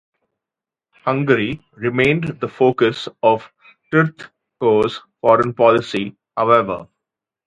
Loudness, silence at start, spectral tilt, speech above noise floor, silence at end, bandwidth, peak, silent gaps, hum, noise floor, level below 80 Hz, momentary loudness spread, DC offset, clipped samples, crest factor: -18 LUFS; 1.05 s; -7 dB/octave; 71 dB; 0.6 s; 10.5 kHz; 0 dBFS; none; none; -88 dBFS; -54 dBFS; 10 LU; under 0.1%; under 0.1%; 18 dB